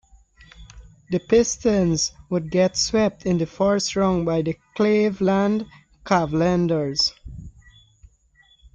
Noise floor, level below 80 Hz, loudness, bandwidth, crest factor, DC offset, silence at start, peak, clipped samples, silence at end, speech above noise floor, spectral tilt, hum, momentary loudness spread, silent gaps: -58 dBFS; -46 dBFS; -21 LUFS; 9.2 kHz; 16 dB; under 0.1%; 0.6 s; -6 dBFS; under 0.1%; 1.25 s; 37 dB; -5 dB/octave; none; 9 LU; none